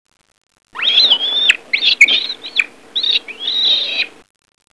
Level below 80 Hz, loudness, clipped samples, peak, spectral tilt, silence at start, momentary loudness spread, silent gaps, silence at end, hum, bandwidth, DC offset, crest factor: -64 dBFS; -12 LUFS; 0.1%; 0 dBFS; 2 dB/octave; 0.75 s; 10 LU; none; 0.65 s; none; 11 kHz; 0.3%; 16 dB